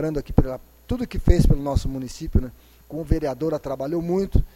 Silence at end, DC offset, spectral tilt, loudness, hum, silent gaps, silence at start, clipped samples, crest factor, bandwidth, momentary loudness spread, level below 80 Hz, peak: 0.1 s; under 0.1%; -8 dB/octave; -24 LUFS; none; none; 0 s; under 0.1%; 22 dB; 15.5 kHz; 12 LU; -26 dBFS; 0 dBFS